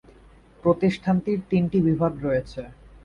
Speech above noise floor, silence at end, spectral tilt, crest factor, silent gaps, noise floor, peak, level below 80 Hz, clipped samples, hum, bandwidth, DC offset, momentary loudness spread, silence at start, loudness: 29 dB; 0.3 s; -9 dB/octave; 16 dB; none; -51 dBFS; -8 dBFS; -48 dBFS; under 0.1%; none; 7.2 kHz; under 0.1%; 13 LU; 0.65 s; -23 LUFS